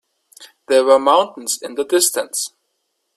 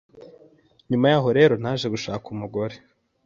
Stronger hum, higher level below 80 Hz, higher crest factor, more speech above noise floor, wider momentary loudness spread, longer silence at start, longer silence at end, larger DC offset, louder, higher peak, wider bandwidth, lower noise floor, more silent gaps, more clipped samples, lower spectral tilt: neither; second, -70 dBFS vs -60 dBFS; about the same, 18 dB vs 20 dB; first, 55 dB vs 34 dB; about the same, 11 LU vs 13 LU; first, 0.4 s vs 0.15 s; first, 0.7 s vs 0.5 s; neither; first, -16 LUFS vs -22 LUFS; first, 0 dBFS vs -4 dBFS; first, 15 kHz vs 7.4 kHz; first, -71 dBFS vs -55 dBFS; neither; neither; second, -0.5 dB/octave vs -6.5 dB/octave